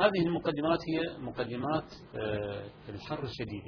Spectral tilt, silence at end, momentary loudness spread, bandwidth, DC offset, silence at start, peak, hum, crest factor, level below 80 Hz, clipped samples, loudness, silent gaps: -7.5 dB/octave; 0 s; 12 LU; 5.4 kHz; under 0.1%; 0 s; -12 dBFS; none; 20 dB; -58 dBFS; under 0.1%; -33 LUFS; none